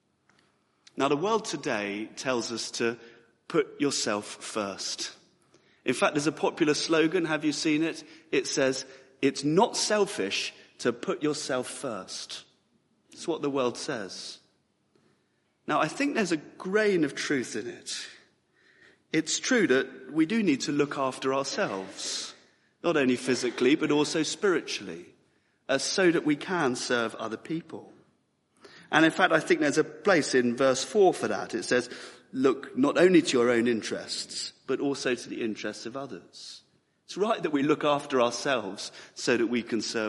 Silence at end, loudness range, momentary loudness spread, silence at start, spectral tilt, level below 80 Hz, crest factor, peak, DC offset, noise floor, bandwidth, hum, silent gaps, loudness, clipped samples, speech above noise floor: 0 s; 7 LU; 13 LU; 0.95 s; -3.5 dB/octave; -74 dBFS; 24 dB; -6 dBFS; under 0.1%; -72 dBFS; 11.5 kHz; none; none; -27 LUFS; under 0.1%; 44 dB